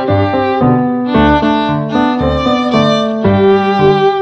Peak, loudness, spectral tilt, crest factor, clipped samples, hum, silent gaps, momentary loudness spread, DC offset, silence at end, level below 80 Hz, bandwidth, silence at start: 0 dBFS; -11 LUFS; -7.5 dB/octave; 10 dB; under 0.1%; none; none; 4 LU; under 0.1%; 0 s; -32 dBFS; 8.2 kHz; 0 s